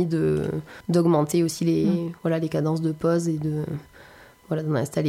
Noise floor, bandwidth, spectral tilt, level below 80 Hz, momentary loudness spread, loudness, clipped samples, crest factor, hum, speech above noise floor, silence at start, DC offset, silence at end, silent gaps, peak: -49 dBFS; 15.5 kHz; -7 dB/octave; -54 dBFS; 9 LU; -24 LUFS; under 0.1%; 14 dB; none; 26 dB; 0 s; under 0.1%; 0 s; none; -10 dBFS